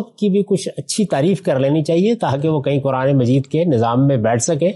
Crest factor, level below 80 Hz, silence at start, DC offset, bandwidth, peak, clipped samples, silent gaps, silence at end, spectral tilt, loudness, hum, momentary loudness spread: 10 dB; -58 dBFS; 0 s; under 0.1%; 11.5 kHz; -6 dBFS; under 0.1%; none; 0 s; -6.5 dB/octave; -17 LUFS; none; 3 LU